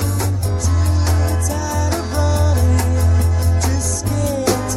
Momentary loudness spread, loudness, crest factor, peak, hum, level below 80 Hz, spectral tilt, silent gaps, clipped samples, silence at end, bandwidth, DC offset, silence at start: 4 LU; -17 LUFS; 14 dB; -2 dBFS; none; -22 dBFS; -5.5 dB/octave; none; under 0.1%; 0 s; 15.5 kHz; under 0.1%; 0 s